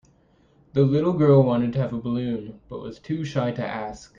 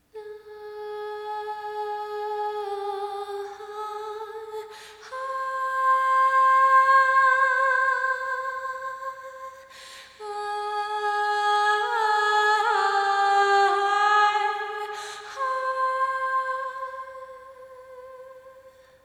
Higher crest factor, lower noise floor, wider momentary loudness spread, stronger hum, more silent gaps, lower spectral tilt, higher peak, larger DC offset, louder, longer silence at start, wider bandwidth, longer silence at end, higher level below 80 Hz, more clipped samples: about the same, 18 dB vs 16 dB; first, -59 dBFS vs -52 dBFS; second, 18 LU vs 23 LU; neither; neither; first, -8.5 dB/octave vs -0.5 dB/octave; about the same, -6 dBFS vs -8 dBFS; neither; about the same, -23 LUFS vs -23 LUFS; first, 0.75 s vs 0.15 s; second, 7.4 kHz vs 13.5 kHz; second, 0.15 s vs 0.35 s; first, -54 dBFS vs -72 dBFS; neither